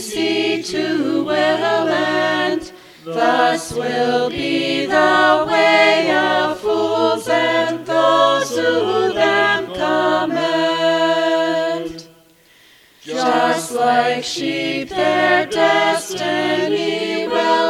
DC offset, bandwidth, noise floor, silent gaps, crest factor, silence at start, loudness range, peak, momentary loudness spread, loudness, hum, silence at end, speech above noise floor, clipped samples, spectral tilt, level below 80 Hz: under 0.1%; 15.5 kHz; -50 dBFS; none; 16 dB; 0 s; 4 LU; 0 dBFS; 7 LU; -17 LUFS; none; 0 s; 34 dB; under 0.1%; -3.5 dB/octave; -56 dBFS